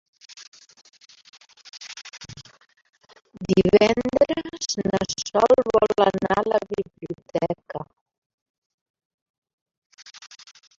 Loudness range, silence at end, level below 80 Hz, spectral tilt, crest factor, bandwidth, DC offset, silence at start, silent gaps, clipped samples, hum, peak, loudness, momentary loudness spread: 15 LU; 0.5 s; -54 dBFS; -5 dB/octave; 22 dB; 7.8 kHz; under 0.1%; 0.3 s; 0.48-0.52 s, 1.29-1.33 s, 8.01-8.06 s, 8.18-8.94 s, 9.05-9.42 s, 9.53-9.66 s, 9.77-9.90 s; under 0.1%; none; -4 dBFS; -21 LUFS; 26 LU